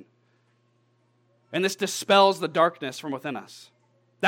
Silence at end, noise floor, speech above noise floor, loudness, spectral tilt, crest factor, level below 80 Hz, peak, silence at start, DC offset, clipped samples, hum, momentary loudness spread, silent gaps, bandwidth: 0 s; -67 dBFS; 42 dB; -24 LUFS; -3.5 dB/octave; 22 dB; -88 dBFS; -4 dBFS; 1.5 s; under 0.1%; under 0.1%; none; 16 LU; none; 17 kHz